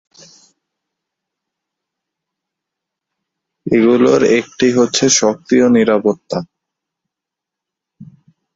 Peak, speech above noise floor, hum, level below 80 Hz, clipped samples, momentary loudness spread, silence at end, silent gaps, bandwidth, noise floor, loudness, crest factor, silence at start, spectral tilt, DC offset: 0 dBFS; 71 dB; none; -56 dBFS; under 0.1%; 11 LU; 0.5 s; none; 7.8 kHz; -83 dBFS; -13 LUFS; 16 dB; 3.65 s; -4 dB/octave; under 0.1%